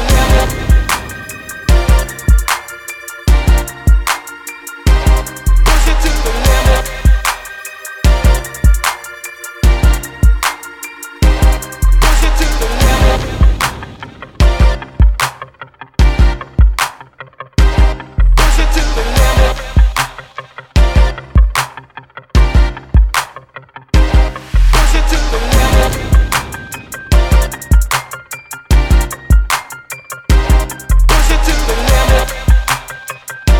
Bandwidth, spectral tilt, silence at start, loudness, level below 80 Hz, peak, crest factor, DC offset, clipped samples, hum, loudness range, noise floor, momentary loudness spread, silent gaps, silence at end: 18 kHz; -4.5 dB/octave; 0 s; -13 LUFS; -12 dBFS; 0 dBFS; 12 dB; 0.4%; under 0.1%; none; 2 LU; -35 dBFS; 15 LU; none; 0 s